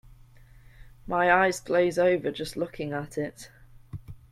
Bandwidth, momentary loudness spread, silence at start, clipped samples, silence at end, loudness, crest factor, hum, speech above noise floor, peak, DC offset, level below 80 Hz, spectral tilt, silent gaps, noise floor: 14.5 kHz; 22 LU; 0.1 s; under 0.1%; 0.15 s; -26 LUFS; 20 dB; none; 26 dB; -8 dBFS; under 0.1%; -54 dBFS; -5 dB/octave; none; -52 dBFS